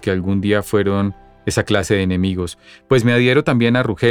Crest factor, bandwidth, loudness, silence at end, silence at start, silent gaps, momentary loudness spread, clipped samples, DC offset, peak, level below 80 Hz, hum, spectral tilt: 16 dB; 17 kHz; -17 LUFS; 0 s; 0 s; none; 9 LU; under 0.1%; under 0.1%; 0 dBFS; -44 dBFS; none; -6 dB/octave